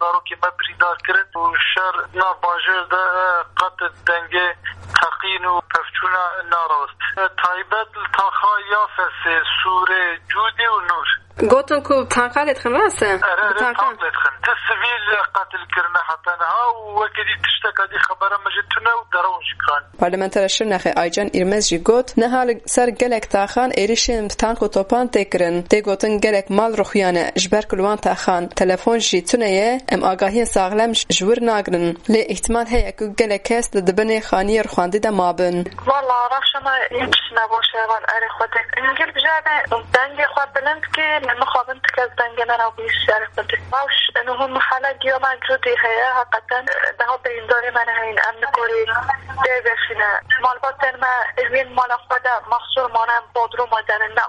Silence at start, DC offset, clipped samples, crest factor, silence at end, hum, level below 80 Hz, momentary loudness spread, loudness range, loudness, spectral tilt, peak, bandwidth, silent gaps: 0 s; under 0.1%; under 0.1%; 18 dB; 0 s; none; -40 dBFS; 4 LU; 2 LU; -18 LUFS; -3 dB/octave; 0 dBFS; 11.5 kHz; none